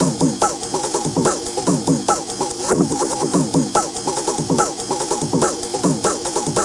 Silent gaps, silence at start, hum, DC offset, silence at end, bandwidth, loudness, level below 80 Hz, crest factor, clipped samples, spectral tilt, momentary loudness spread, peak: none; 0 s; none; under 0.1%; 0 s; 11.5 kHz; -19 LUFS; -48 dBFS; 18 dB; under 0.1%; -4 dB/octave; 3 LU; -2 dBFS